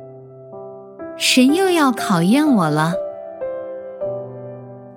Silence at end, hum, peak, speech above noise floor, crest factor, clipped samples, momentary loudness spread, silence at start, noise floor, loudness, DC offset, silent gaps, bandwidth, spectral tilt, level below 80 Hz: 0 s; none; -2 dBFS; 23 dB; 16 dB; under 0.1%; 22 LU; 0 s; -38 dBFS; -17 LUFS; under 0.1%; none; 16.5 kHz; -4.5 dB/octave; -66 dBFS